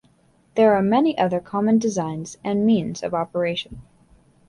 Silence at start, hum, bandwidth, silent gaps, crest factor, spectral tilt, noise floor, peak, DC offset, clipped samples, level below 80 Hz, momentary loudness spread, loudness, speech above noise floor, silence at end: 0.55 s; none; 11 kHz; none; 16 dB; -6 dB/octave; -59 dBFS; -4 dBFS; under 0.1%; under 0.1%; -56 dBFS; 12 LU; -21 LUFS; 38 dB; 0.7 s